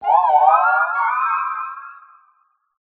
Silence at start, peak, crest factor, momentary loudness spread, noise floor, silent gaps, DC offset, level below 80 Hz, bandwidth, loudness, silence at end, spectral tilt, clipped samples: 0 s; -2 dBFS; 18 dB; 15 LU; -62 dBFS; none; under 0.1%; -70 dBFS; 4.4 kHz; -16 LUFS; 0.9 s; 2.5 dB/octave; under 0.1%